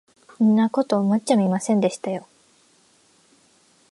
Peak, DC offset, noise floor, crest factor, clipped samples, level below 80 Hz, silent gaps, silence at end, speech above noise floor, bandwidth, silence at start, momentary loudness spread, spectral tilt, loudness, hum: -4 dBFS; under 0.1%; -59 dBFS; 18 dB; under 0.1%; -74 dBFS; none; 1.7 s; 39 dB; 11.5 kHz; 0.4 s; 11 LU; -6.5 dB/octave; -21 LUFS; none